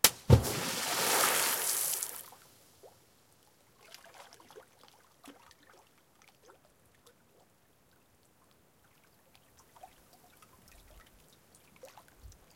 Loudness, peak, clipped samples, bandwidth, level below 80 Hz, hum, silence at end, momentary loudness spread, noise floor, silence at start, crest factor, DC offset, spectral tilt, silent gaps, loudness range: -28 LUFS; -2 dBFS; under 0.1%; 16.5 kHz; -52 dBFS; none; 0.25 s; 29 LU; -68 dBFS; 0.05 s; 34 dB; under 0.1%; -3 dB/octave; none; 28 LU